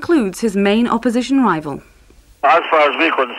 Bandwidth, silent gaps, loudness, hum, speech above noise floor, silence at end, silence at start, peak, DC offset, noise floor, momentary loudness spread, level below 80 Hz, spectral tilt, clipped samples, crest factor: 13.5 kHz; none; -15 LUFS; none; 32 dB; 0 s; 0 s; -2 dBFS; under 0.1%; -47 dBFS; 7 LU; -50 dBFS; -5 dB/octave; under 0.1%; 14 dB